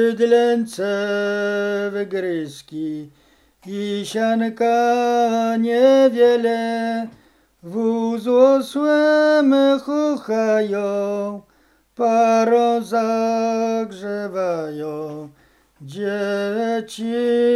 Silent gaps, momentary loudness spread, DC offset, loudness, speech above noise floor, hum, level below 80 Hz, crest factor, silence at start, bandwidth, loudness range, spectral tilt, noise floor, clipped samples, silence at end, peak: none; 13 LU; under 0.1%; -19 LUFS; 40 dB; none; -66 dBFS; 16 dB; 0 s; 12.5 kHz; 7 LU; -5.5 dB/octave; -58 dBFS; under 0.1%; 0 s; -2 dBFS